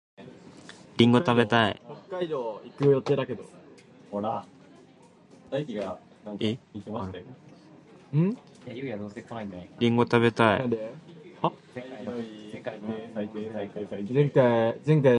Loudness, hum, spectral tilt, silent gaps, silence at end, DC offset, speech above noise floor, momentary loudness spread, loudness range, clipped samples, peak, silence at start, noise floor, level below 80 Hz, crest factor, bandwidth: -27 LUFS; none; -7.5 dB/octave; none; 0 s; under 0.1%; 29 dB; 20 LU; 10 LU; under 0.1%; -4 dBFS; 0.2 s; -55 dBFS; -62 dBFS; 24 dB; 9.8 kHz